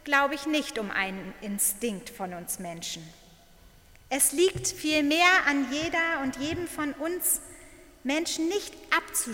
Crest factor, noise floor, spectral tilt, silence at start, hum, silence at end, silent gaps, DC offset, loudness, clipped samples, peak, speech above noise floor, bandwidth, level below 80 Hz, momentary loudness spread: 22 dB; -55 dBFS; -2 dB/octave; 0.05 s; none; 0 s; none; under 0.1%; -27 LUFS; under 0.1%; -6 dBFS; 27 dB; 17 kHz; -56 dBFS; 14 LU